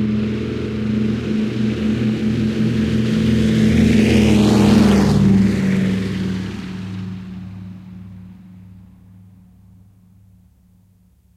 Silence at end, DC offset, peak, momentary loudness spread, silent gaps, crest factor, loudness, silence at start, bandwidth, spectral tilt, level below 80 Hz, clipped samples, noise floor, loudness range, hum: 2.55 s; under 0.1%; -2 dBFS; 19 LU; none; 16 dB; -17 LUFS; 0 s; 13 kHz; -7 dB/octave; -36 dBFS; under 0.1%; -53 dBFS; 18 LU; none